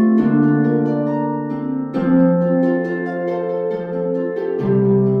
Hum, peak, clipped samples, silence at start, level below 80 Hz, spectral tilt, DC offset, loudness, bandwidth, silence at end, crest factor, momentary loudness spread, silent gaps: none; -4 dBFS; under 0.1%; 0 s; -56 dBFS; -11 dB/octave; under 0.1%; -18 LUFS; 5.2 kHz; 0 s; 12 dB; 8 LU; none